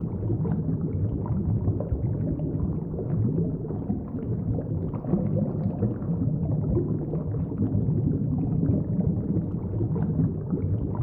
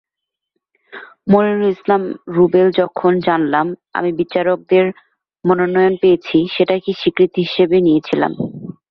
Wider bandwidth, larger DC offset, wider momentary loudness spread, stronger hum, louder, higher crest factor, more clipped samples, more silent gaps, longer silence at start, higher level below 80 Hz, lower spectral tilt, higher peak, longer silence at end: second, 2.3 kHz vs 5.8 kHz; neither; second, 5 LU vs 8 LU; neither; second, -27 LUFS vs -15 LUFS; about the same, 14 dB vs 14 dB; neither; neither; second, 0 s vs 0.95 s; first, -40 dBFS vs -56 dBFS; first, -14.5 dB/octave vs -8.5 dB/octave; second, -12 dBFS vs -2 dBFS; second, 0 s vs 0.2 s